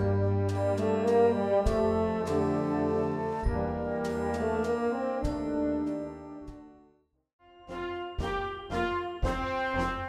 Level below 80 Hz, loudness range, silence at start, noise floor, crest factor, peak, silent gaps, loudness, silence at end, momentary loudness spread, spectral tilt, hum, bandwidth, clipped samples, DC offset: -42 dBFS; 8 LU; 0 s; -66 dBFS; 16 dB; -14 dBFS; 7.33-7.39 s; -30 LUFS; 0 s; 10 LU; -7.5 dB/octave; none; 12.5 kHz; under 0.1%; under 0.1%